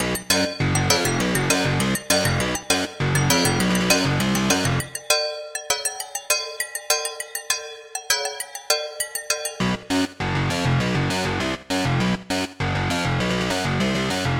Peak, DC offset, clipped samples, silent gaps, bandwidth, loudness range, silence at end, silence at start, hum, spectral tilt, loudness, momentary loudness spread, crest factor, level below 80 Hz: 0 dBFS; under 0.1%; under 0.1%; none; 17 kHz; 4 LU; 0 s; 0 s; none; -3.5 dB/octave; -22 LUFS; 7 LU; 22 dB; -42 dBFS